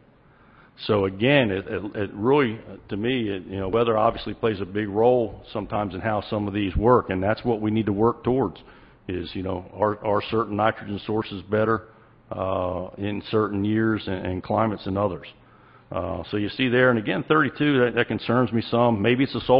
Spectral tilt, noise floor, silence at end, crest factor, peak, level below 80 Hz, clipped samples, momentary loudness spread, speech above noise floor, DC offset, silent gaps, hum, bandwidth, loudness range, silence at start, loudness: -11 dB/octave; -54 dBFS; 0 s; 20 dB; -4 dBFS; -46 dBFS; under 0.1%; 10 LU; 31 dB; under 0.1%; none; none; 5.6 kHz; 4 LU; 0.8 s; -24 LUFS